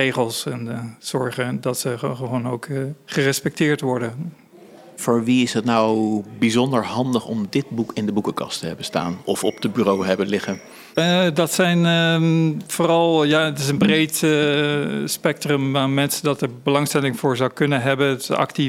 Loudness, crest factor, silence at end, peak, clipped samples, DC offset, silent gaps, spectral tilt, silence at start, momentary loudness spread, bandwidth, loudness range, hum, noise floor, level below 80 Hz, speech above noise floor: -20 LUFS; 18 dB; 0 s; -2 dBFS; under 0.1%; under 0.1%; none; -5 dB/octave; 0 s; 9 LU; 16.5 kHz; 6 LU; none; -45 dBFS; -62 dBFS; 25 dB